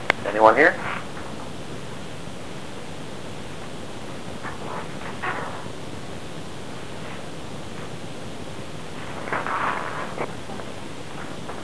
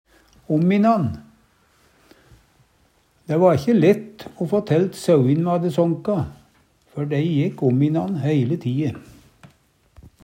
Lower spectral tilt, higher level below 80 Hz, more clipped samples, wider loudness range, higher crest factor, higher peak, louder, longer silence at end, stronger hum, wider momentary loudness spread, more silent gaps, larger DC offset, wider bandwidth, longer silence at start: second, -4.5 dB/octave vs -8.5 dB/octave; about the same, -52 dBFS vs -56 dBFS; neither; first, 11 LU vs 4 LU; first, 28 dB vs 18 dB; first, 0 dBFS vs -4 dBFS; second, -28 LUFS vs -20 LUFS; second, 0 s vs 0.8 s; neither; about the same, 14 LU vs 12 LU; neither; first, 2% vs under 0.1%; second, 11 kHz vs 16 kHz; second, 0 s vs 0.5 s